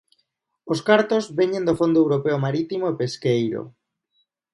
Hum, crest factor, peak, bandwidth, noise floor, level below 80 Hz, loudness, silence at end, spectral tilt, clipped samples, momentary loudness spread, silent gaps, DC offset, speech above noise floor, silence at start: none; 20 dB; -2 dBFS; 11.5 kHz; -72 dBFS; -60 dBFS; -21 LUFS; 0.85 s; -6.5 dB/octave; under 0.1%; 9 LU; none; under 0.1%; 52 dB; 0.65 s